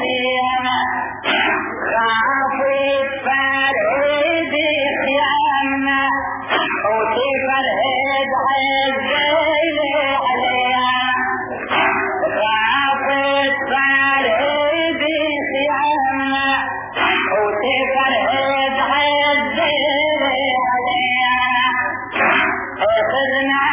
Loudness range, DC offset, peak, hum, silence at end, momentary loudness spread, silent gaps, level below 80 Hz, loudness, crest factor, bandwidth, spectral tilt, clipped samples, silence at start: 1 LU; under 0.1%; -2 dBFS; none; 0 s; 4 LU; none; -50 dBFS; -16 LUFS; 14 dB; 3.9 kHz; -6.5 dB/octave; under 0.1%; 0 s